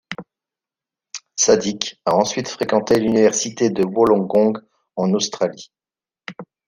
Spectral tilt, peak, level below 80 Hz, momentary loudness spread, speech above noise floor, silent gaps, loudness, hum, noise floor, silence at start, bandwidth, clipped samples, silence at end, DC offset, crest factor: -4 dB/octave; -2 dBFS; -58 dBFS; 19 LU; over 72 dB; none; -18 LUFS; none; under -90 dBFS; 0.1 s; 15 kHz; under 0.1%; 0.25 s; under 0.1%; 18 dB